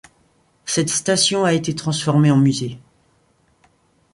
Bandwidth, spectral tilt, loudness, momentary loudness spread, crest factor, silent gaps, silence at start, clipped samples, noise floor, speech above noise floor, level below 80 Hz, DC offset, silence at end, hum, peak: 11.5 kHz; -4.5 dB/octave; -18 LUFS; 10 LU; 16 dB; none; 0.65 s; under 0.1%; -60 dBFS; 43 dB; -58 dBFS; under 0.1%; 1.35 s; none; -4 dBFS